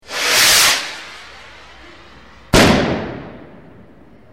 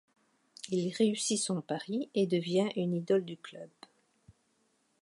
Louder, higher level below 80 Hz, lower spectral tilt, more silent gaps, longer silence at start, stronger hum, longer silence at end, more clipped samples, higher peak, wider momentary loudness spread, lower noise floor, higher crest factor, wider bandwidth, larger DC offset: first, -12 LUFS vs -32 LUFS; first, -34 dBFS vs -80 dBFS; second, -2.5 dB/octave vs -5 dB/octave; neither; second, 0.1 s vs 0.65 s; neither; second, 0.95 s vs 1.35 s; neither; first, 0 dBFS vs -16 dBFS; first, 24 LU vs 18 LU; second, -45 dBFS vs -74 dBFS; about the same, 18 dB vs 18 dB; first, 16.5 kHz vs 11.5 kHz; first, 0.4% vs under 0.1%